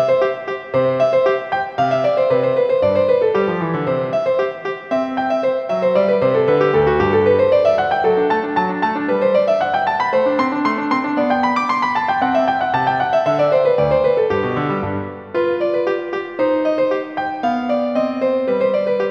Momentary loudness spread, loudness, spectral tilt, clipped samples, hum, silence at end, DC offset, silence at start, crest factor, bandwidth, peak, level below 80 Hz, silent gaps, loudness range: 6 LU; -17 LUFS; -7 dB/octave; under 0.1%; none; 0 s; under 0.1%; 0 s; 14 dB; 7 kHz; -2 dBFS; -48 dBFS; none; 3 LU